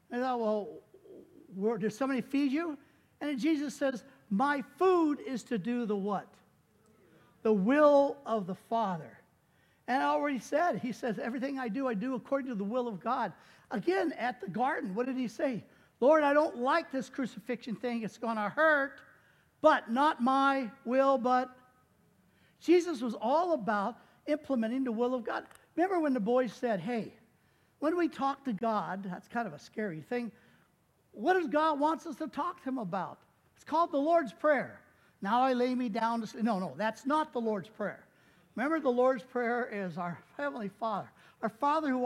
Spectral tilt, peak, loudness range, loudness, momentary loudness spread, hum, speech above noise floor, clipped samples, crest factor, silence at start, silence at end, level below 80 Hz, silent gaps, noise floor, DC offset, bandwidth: -6 dB/octave; -10 dBFS; 4 LU; -32 LUFS; 12 LU; none; 39 dB; under 0.1%; 22 dB; 0.1 s; 0 s; -78 dBFS; none; -70 dBFS; under 0.1%; 14 kHz